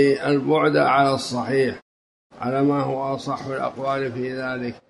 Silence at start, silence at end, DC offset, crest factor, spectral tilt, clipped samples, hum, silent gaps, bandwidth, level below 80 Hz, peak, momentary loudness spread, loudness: 0 s; 0.1 s; under 0.1%; 16 dB; -6 dB/octave; under 0.1%; none; 1.82-2.30 s; 11.5 kHz; -60 dBFS; -6 dBFS; 10 LU; -22 LUFS